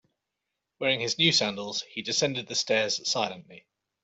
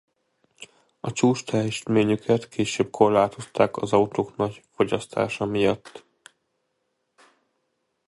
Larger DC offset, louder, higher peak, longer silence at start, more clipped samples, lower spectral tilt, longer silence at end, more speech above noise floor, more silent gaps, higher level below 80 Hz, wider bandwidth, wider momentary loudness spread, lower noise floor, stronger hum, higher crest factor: neither; about the same, -26 LUFS vs -24 LUFS; second, -8 dBFS vs -4 dBFS; first, 0.8 s vs 0.6 s; neither; second, -2.5 dB/octave vs -5.5 dB/octave; second, 0.45 s vs 2.1 s; first, 56 dB vs 52 dB; neither; second, -70 dBFS vs -58 dBFS; second, 8.2 kHz vs 11.5 kHz; first, 11 LU vs 7 LU; first, -84 dBFS vs -75 dBFS; neither; about the same, 20 dB vs 22 dB